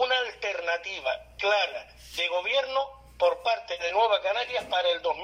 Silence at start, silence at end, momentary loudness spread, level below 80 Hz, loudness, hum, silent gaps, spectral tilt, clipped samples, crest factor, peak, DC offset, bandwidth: 0 s; 0 s; 7 LU; -60 dBFS; -27 LUFS; none; none; -1 dB/octave; under 0.1%; 16 dB; -12 dBFS; under 0.1%; 15.5 kHz